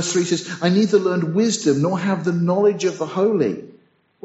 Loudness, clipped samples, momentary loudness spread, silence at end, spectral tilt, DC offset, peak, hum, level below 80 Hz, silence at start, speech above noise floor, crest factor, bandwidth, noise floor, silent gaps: -19 LUFS; under 0.1%; 5 LU; 0.55 s; -5.5 dB/octave; under 0.1%; -4 dBFS; none; -66 dBFS; 0 s; 36 dB; 14 dB; 8.2 kHz; -54 dBFS; none